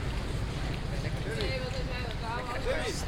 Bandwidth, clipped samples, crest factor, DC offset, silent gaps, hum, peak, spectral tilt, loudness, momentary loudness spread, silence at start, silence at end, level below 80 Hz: 16 kHz; under 0.1%; 16 dB; under 0.1%; none; none; -16 dBFS; -5 dB/octave; -34 LUFS; 3 LU; 0 s; 0 s; -38 dBFS